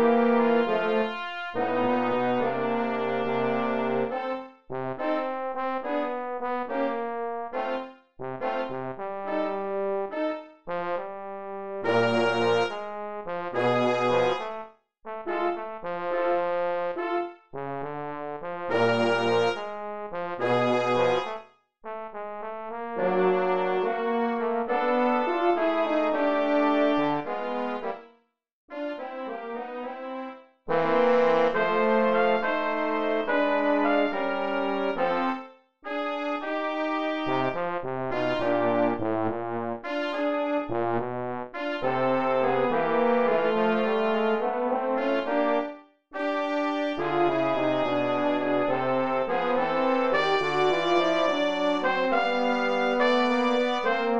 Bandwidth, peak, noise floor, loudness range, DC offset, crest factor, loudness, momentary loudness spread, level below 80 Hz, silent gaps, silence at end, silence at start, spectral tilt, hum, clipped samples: 8.4 kHz; -10 dBFS; -64 dBFS; 6 LU; 0.6%; 16 dB; -26 LUFS; 12 LU; -64 dBFS; 28.51-28.68 s; 0 s; 0 s; -6 dB/octave; none; under 0.1%